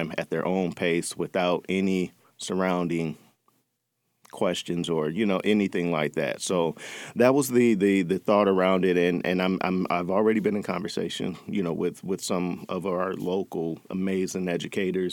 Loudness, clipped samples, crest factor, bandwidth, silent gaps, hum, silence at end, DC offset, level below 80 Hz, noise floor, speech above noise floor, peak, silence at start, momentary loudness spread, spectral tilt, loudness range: -26 LUFS; under 0.1%; 20 dB; 17.5 kHz; none; none; 0 s; under 0.1%; -66 dBFS; -77 dBFS; 52 dB; -6 dBFS; 0 s; 9 LU; -5.5 dB/octave; 6 LU